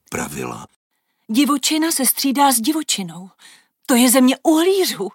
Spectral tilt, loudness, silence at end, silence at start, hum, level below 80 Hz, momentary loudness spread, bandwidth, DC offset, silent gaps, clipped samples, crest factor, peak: -2.5 dB/octave; -16 LUFS; 0.05 s; 0.1 s; none; -58 dBFS; 16 LU; 17 kHz; under 0.1%; 0.76-0.90 s; under 0.1%; 16 dB; -2 dBFS